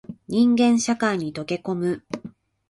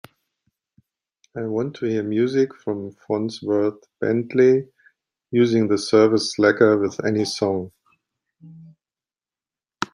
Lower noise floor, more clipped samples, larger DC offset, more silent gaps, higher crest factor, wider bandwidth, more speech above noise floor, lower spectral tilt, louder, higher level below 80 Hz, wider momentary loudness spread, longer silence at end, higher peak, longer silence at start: second, -43 dBFS vs under -90 dBFS; neither; neither; neither; second, 14 dB vs 20 dB; about the same, 11.5 kHz vs 11 kHz; second, 22 dB vs over 70 dB; about the same, -5 dB/octave vs -5.5 dB/octave; about the same, -22 LUFS vs -21 LUFS; first, -62 dBFS vs -68 dBFS; about the same, 13 LU vs 12 LU; first, 0.4 s vs 0.1 s; second, -8 dBFS vs -2 dBFS; second, 0.1 s vs 1.35 s